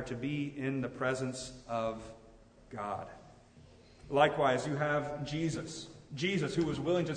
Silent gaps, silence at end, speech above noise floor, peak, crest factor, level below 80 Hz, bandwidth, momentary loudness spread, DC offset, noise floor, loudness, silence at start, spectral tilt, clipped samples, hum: none; 0 s; 25 dB; -12 dBFS; 22 dB; -60 dBFS; 9.6 kHz; 16 LU; under 0.1%; -58 dBFS; -34 LUFS; 0 s; -5.5 dB/octave; under 0.1%; none